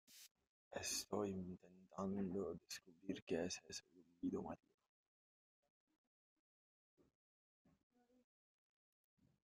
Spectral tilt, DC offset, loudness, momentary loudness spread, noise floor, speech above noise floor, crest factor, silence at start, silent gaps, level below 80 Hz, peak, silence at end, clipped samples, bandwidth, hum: -4 dB/octave; under 0.1%; -48 LUFS; 14 LU; under -90 dBFS; over 43 dB; 22 dB; 0.1 s; 0.31-0.35 s, 0.47-0.71 s, 3.22-3.27 s; -82 dBFS; -30 dBFS; 4.95 s; under 0.1%; 14.5 kHz; none